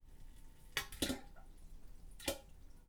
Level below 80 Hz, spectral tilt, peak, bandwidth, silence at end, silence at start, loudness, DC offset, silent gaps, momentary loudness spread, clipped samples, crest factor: -56 dBFS; -2.5 dB/octave; -20 dBFS; over 20 kHz; 0 s; 0 s; -43 LUFS; under 0.1%; none; 22 LU; under 0.1%; 26 dB